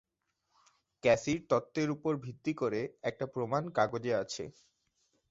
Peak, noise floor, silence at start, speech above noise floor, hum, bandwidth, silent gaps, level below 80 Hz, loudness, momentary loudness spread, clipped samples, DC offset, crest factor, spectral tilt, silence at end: -14 dBFS; -82 dBFS; 1.05 s; 49 dB; none; 8 kHz; none; -68 dBFS; -33 LUFS; 9 LU; under 0.1%; under 0.1%; 22 dB; -5.5 dB/octave; 0.8 s